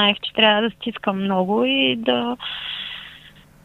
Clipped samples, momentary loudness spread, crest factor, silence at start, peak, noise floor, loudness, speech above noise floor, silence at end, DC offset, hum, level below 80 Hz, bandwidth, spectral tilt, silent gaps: under 0.1%; 13 LU; 20 dB; 0 s; -2 dBFS; -47 dBFS; -20 LUFS; 26 dB; 0.35 s; under 0.1%; none; -58 dBFS; 10 kHz; -6.5 dB/octave; none